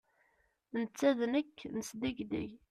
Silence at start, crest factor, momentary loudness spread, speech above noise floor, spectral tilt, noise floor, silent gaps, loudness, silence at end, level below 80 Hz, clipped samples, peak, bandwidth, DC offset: 0.75 s; 20 dB; 10 LU; 40 dB; -5 dB/octave; -75 dBFS; none; -36 LUFS; 0.15 s; -68 dBFS; under 0.1%; -16 dBFS; 14 kHz; under 0.1%